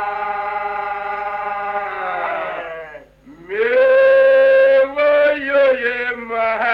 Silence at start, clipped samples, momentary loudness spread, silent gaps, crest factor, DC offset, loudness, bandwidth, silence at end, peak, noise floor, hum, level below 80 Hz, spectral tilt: 0 s; under 0.1%; 13 LU; none; 12 dB; under 0.1%; -16 LUFS; 5.2 kHz; 0 s; -4 dBFS; -42 dBFS; none; -54 dBFS; -5 dB/octave